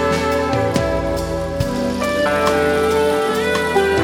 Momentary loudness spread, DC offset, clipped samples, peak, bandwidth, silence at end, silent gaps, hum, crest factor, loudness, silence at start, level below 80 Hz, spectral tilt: 5 LU; under 0.1%; under 0.1%; -2 dBFS; 16.5 kHz; 0 s; none; none; 16 dB; -18 LUFS; 0 s; -34 dBFS; -5 dB/octave